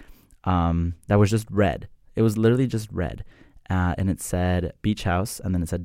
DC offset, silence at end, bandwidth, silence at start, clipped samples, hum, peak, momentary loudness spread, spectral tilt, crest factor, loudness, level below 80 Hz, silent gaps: under 0.1%; 0 s; 16 kHz; 0 s; under 0.1%; none; -6 dBFS; 10 LU; -7 dB/octave; 18 dB; -24 LUFS; -40 dBFS; none